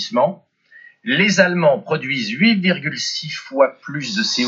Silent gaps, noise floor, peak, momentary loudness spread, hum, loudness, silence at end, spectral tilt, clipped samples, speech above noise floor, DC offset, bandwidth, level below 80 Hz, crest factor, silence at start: none; -47 dBFS; 0 dBFS; 10 LU; none; -18 LUFS; 0 s; -4.5 dB/octave; under 0.1%; 29 dB; under 0.1%; 7.8 kHz; -78 dBFS; 18 dB; 0 s